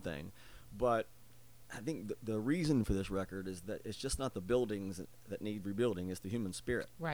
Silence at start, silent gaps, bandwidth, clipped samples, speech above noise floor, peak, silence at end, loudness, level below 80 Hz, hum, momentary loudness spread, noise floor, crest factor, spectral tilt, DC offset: 0 s; none; over 20 kHz; under 0.1%; 24 dB; -20 dBFS; 0 s; -38 LUFS; -54 dBFS; none; 13 LU; -62 dBFS; 18 dB; -6 dB/octave; 0.1%